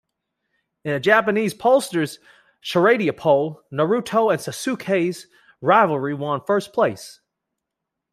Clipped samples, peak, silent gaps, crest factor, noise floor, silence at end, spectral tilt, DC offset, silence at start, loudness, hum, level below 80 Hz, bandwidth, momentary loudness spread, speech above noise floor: under 0.1%; -2 dBFS; none; 20 dB; -82 dBFS; 1 s; -5.5 dB/octave; under 0.1%; 0.85 s; -20 LUFS; none; -66 dBFS; 14.5 kHz; 11 LU; 62 dB